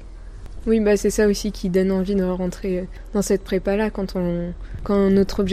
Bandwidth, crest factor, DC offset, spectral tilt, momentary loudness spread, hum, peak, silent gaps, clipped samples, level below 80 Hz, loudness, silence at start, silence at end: 15.5 kHz; 14 dB; under 0.1%; -6 dB/octave; 10 LU; none; -6 dBFS; none; under 0.1%; -34 dBFS; -21 LUFS; 0 s; 0 s